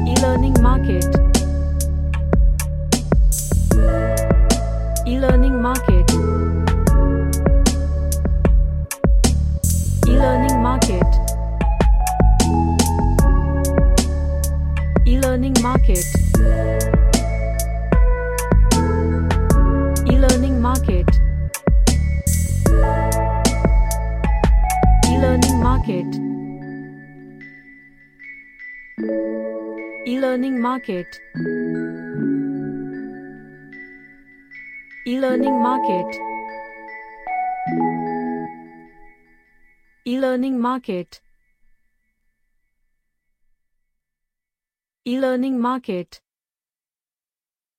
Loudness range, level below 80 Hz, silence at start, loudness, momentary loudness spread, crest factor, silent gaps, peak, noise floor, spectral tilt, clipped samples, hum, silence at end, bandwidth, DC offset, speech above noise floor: 10 LU; -20 dBFS; 0 s; -18 LUFS; 15 LU; 16 dB; none; 0 dBFS; under -90 dBFS; -6 dB/octave; under 0.1%; none; 1.75 s; 15.5 kHz; under 0.1%; over 71 dB